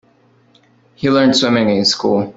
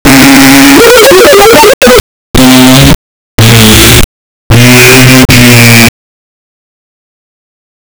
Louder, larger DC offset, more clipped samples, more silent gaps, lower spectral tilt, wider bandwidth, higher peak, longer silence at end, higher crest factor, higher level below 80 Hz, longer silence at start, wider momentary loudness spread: second, -14 LUFS vs -1 LUFS; neither; second, under 0.1% vs 50%; second, none vs 1.74-1.81 s, 2.00-2.34 s, 2.95-3.38 s, 4.04-4.50 s; about the same, -4.5 dB/octave vs -4 dB/octave; second, 8 kHz vs over 20 kHz; about the same, -2 dBFS vs 0 dBFS; second, 0.05 s vs 2.1 s; first, 14 dB vs 2 dB; second, -56 dBFS vs -18 dBFS; first, 1 s vs 0.05 s; second, 4 LU vs 7 LU